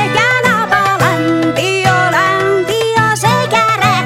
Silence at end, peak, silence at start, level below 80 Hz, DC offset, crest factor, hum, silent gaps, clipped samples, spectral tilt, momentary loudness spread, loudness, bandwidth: 0 s; 0 dBFS; 0 s; -46 dBFS; under 0.1%; 12 dB; none; none; under 0.1%; -4.5 dB/octave; 3 LU; -11 LUFS; 16.5 kHz